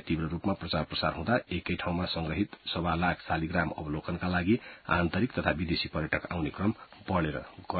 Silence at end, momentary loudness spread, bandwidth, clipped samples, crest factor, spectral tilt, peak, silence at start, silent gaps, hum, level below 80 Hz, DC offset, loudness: 0 s; 5 LU; 4.8 kHz; under 0.1%; 22 dB; -10 dB/octave; -8 dBFS; 0.05 s; none; none; -46 dBFS; under 0.1%; -31 LUFS